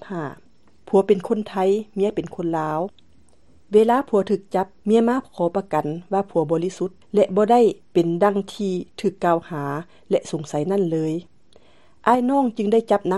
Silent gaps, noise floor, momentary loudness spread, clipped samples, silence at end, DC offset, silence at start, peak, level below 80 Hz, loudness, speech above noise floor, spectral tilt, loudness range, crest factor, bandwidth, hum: none; -57 dBFS; 9 LU; under 0.1%; 0 s; 0.3%; 0.05 s; -2 dBFS; -62 dBFS; -21 LUFS; 37 dB; -7 dB/octave; 3 LU; 20 dB; 12 kHz; none